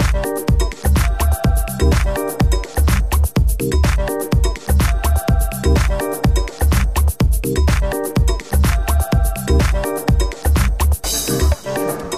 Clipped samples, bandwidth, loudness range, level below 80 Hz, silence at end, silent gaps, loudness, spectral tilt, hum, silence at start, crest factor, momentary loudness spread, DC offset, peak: under 0.1%; 15.5 kHz; 0 LU; -18 dBFS; 0 s; none; -18 LUFS; -5.5 dB/octave; none; 0 s; 12 dB; 2 LU; 0.8%; -4 dBFS